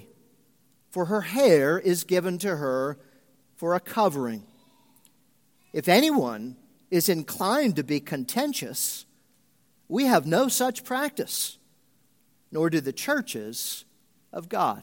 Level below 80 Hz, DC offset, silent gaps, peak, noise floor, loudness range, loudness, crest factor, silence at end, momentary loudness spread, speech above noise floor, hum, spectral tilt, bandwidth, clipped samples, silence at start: -76 dBFS; under 0.1%; none; -4 dBFS; -66 dBFS; 5 LU; -25 LUFS; 22 dB; 0 s; 13 LU; 41 dB; none; -4 dB/octave; 17 kHz; under 0.1%; 0.95 s